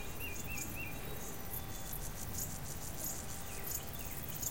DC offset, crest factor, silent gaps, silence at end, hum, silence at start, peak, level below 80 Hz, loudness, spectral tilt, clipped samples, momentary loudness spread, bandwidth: 0.5%; 18 dB; none; 0 s; none; 0 s; -24 dBFS; -52 dBFS; -42 LUFS; -3 dB/octave; under 0.1%; 3 LU; 17 kHz